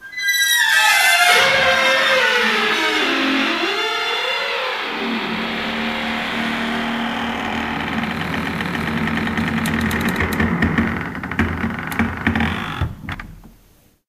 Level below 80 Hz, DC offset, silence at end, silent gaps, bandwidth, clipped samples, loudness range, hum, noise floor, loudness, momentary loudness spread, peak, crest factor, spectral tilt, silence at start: -38 dBFS; under 0.1%; 0.6 s; none; 15.5 kHz; under 0.1%; 8 LU; none; -53 dBFS; -18 LUFS; 10 LU; 0 dBFS; 18 dB; -3.5 dB/octave; 0 s